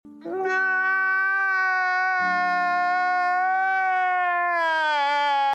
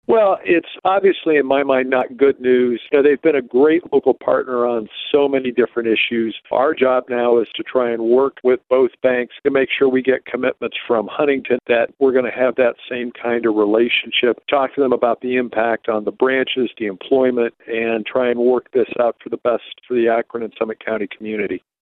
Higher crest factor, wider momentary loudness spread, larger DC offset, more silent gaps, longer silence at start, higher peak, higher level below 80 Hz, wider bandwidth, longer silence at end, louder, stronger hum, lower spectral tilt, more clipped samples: second, 10 dB vs 16 dB; second, 1 LU vs 7 LU; neither; neither; about the same, 0.05 s vs 0.1 s; second, -12 dBFS vs -2 dBFS; second, -80 dBFS vs -62 dBFS; first, 8.8 kHz vs 4.2 kHz; second, 0 s vs 0.3 s; second, -22 LUFS vs -18 LUFS; neither; second, -3 dB/octave vs -8.5 dB/octave; neither